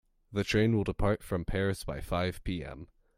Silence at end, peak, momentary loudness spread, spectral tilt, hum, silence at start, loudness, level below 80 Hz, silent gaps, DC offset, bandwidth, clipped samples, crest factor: 0.3 s; -14 dBFS; 11 LU; -6.5 dB/octave; none; 0.3 s; -32 LUFS; -44 dBFS; none; under 0.1%; 16 kHz; under 0.1%; 18 dB